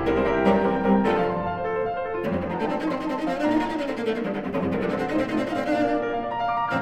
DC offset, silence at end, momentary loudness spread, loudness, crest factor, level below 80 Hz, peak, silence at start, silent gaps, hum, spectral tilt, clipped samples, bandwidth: under 0.1%; 0 s; 6 LU; -25 LUFS; 16 dB; -46 dBFS; -8 dBFS; 0 s; none; none; -7.5 dB/octave; under 0.1%; 13 kHz